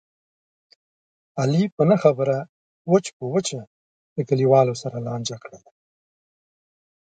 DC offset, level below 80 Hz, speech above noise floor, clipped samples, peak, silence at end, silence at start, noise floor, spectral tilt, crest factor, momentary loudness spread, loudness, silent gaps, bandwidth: under 0.1%; -66 dBFS; over 69 dB; under 0.1%; -2 dBFS; 1.45 s; 1.35 s; under -90 dBFS; -6.5 dB/octave; 22 dB; 18 LU; -21 LUFS; 1.72-1.77 s, 2.49-2.85 s, 3.13-3.20 s, 3.67-4.16 s; 9.2 kHz